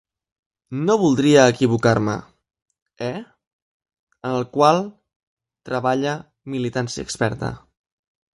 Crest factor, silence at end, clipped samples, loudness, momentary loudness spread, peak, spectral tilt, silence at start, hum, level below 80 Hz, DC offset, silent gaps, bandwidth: 20 dB; 0.8 s; under 0.1%; -20 LUFS; 17 LU; -2 dBFS; -5.5 dB/octave; 0.7 s; none; -54 dBFS; under 0.1%; 2.62-2.66 s, 2.82-2.86 s, 3.47-3.80 s, 3.99-4.07 s, 5.16-5.37 s; 11.5 kHz